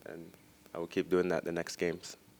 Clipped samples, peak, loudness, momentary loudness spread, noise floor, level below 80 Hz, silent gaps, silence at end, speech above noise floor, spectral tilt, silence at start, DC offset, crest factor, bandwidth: under 0.1%; -18 dBFS; -35 LUFS; 18 LU; -57 dBFS; -70 dBFS; none; 0.25 s; 23 dB; -5 dB/octave; 0.05 s; under 0.1%; 18 dB; over 20 kHz